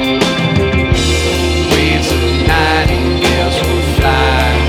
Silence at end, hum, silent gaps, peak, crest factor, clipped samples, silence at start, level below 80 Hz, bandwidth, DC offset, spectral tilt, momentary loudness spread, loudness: 0 s; none; none; 0 dBFS; 12 dB; under 0.1%; 0 s; -18 dBFS; 16 kHz; under 0.1%; -5 dB/octave; 2 LU; -12 LUFS